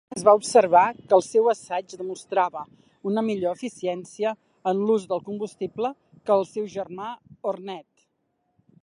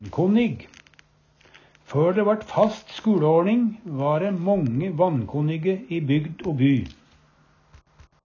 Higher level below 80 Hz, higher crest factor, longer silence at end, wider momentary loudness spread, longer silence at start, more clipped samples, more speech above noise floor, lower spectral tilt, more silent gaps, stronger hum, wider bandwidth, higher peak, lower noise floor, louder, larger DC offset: second, -72 dBFS vs -54 dBFS; first, 22 dB vs 16 dB; second, 1.05 s vs 1.3 s; first, 16 LU vs 8 LU; about the same, 0.1 s vs 0 s; neither; first, 50 dB vs 37 dB; second, -5 dB/octave vs -8.5 dB/octave; neither; neither; first, 11.5 kHz vs 7.2 kHz; about the same, -4 dBFS vs -6 dBFS; first, -73 dBFS vs -59 dBFS; about the same, -24 LUFS vs -23 LUFS; neither